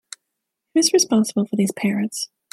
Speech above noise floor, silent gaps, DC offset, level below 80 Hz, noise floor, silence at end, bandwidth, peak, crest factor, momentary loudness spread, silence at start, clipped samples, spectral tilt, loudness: 60 dB; none; under 0.1%; -68 dBFS; -80 dBFS; 0.25 s; 15 kHz; -4 dBFS; 18 dB; 14 LU; 0.75 s; under 0.1%; -4 dB/octave; -20 LUFS